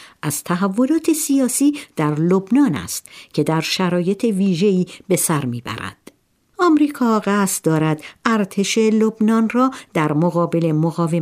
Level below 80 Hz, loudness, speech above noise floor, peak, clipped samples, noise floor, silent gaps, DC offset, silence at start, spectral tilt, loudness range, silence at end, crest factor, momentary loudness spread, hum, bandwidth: -60 dBFS; -18 LUFS; 39 dB; -2 dBFS; under 0.1%; -56 dBFS; none; under 0.1%; 0 s; -5.5 dB/octave; 2 LU; 0 s; 16 dB; 7 LU; none; 16 kHz